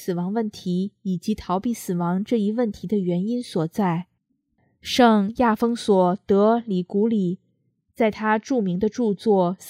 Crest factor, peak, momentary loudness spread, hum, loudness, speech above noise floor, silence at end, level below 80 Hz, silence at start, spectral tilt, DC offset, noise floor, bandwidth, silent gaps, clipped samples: 20 dB; -2 dBFS; 8 LU; none; -22 LUFS; 49 dB; 0 s; -56 dBFS; 0 s; -6.5 dB/octave; under 0.1%; -71 dBFS; 15.5 kHz; none; under 0.1%